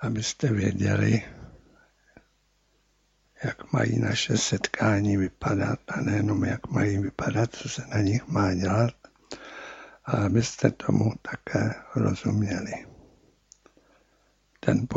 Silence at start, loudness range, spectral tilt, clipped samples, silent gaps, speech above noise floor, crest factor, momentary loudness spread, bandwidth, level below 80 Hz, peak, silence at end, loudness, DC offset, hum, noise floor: 0 s; 5 LU; -5.5 dB/octave; under 0.1%; none; 42 dB; 22 dB; 12 LU; 8 kHz; -54 dBFS; -4 dBFS; 0 s; -26 LUFS; under 0.1%; none; -68 dBFS